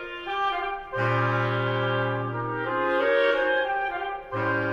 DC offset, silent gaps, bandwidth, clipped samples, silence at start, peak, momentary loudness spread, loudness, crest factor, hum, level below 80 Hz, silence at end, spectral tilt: under 0.1%; none; 7 kHz; under 0.1%; 0 s; -10 dBFS; 8 LU; -26 LUFS; 16 dB; none; -54 dBFS; 0 s; -7.5 dB/octave